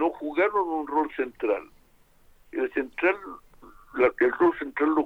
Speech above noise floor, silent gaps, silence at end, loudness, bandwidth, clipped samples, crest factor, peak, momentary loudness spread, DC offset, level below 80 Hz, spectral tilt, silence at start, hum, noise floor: 33 dB; none; 0 s; -26 LUFS; 4.6 kHz; under 0.1%; 18 dB; -8 dBFS; 12 LU; under 0.1%; -58 dBFS; -6.5 dB/octave; 0 s; none; -59 dBFS